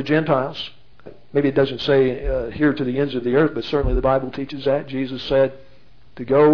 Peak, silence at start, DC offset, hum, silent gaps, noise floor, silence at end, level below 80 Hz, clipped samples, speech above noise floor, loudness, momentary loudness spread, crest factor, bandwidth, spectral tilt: -4 dBFS; 0 s; 1%; none; none; -52 dBFS; 0 s; -34 dBFS; under 0.1%; 33 dB; -20 LUFS; 8 LU; 16 dB; 5.4 kHz; -8 dB/octave